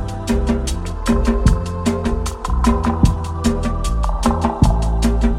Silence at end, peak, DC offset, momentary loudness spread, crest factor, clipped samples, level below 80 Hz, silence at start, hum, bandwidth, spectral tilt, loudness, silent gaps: 0 s; -2 dBFS; under 0.1%; 5 LU; 16 dB; under 0.1%; -20 dBFS; 0 s; none; 13.5 kHz; -6.5 dB/octave; -19 LUFS; none